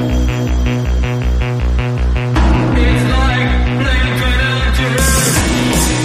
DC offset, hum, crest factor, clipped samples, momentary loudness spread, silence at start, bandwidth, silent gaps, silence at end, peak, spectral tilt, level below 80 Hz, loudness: under 0.1%; none; 12 dB; under 0.1%; 4 LU; 0 s; 15.5 kHz; none; 0 s; 0 dBFS; -4.5 dB/octave; -16 dBFS; -14 LUFS